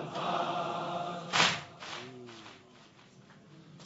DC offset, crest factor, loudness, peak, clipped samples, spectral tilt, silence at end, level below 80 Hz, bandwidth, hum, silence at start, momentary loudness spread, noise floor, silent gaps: under 0.1%; 26 dB; -32 LUFS; -10 dBFS; under 0.1%; -1 dB/octave; 0 s; -76 dBFS; 8 kHz; none; 0 s; 22 LU; -58 dBFS; none